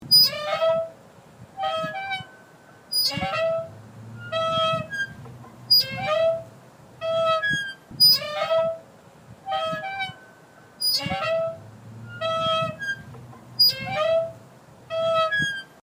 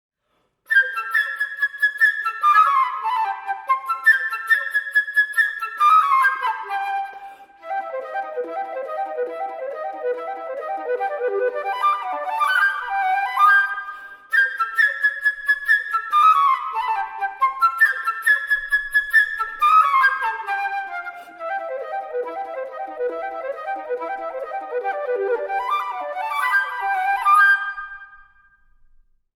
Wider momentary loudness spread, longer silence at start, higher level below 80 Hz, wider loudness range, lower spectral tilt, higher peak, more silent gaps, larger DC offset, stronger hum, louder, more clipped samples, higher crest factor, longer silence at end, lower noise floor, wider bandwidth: first, 20 LU vs 14 LU; second, 0 s vs 0.7 s; about the same, -62 dBFS vs -62 dBFS; second, 6 LU vs 10 LU; first, -2.5 dB/octave vs 0 dB/octave; second, -8 dBFS vs -4 dBFS; neither; neither; neither; second, -23 LUFS vs -20 LUFS; neither; about the same, 18 dB vs 16 dB; second, 0.3 s vs 1.15 s; second, -50 dBFS vs -69 dBFS; second, 16 kHz vs 19 kHz